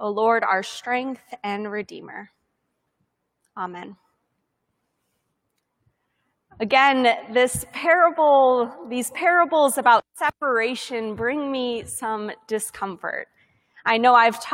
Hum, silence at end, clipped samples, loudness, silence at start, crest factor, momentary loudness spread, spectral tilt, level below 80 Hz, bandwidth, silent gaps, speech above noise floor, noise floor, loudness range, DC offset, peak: none; 0 s; under 0.1%; -21 LUFS; 0 s; 20 dB; 16 LU; -3 dB/octave; -62 dBFS; 16.5 kHz; none; 54 dB; -75 dBFS; 22 LU; under 0.1%; -4 dBFS